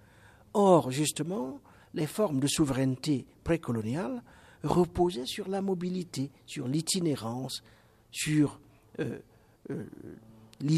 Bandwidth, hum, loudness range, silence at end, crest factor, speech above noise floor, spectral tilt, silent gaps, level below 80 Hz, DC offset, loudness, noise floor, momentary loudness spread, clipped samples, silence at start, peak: 15 kHz; none; 5 LU; 0 s; 22 dB; 27 dB; -5.5 dB/octave; none; -56 dBFS; under 0.1%; -30 LUFS; -57 dBFS; 14 LU; under 0.1%; 0.55 s; -10 dBFS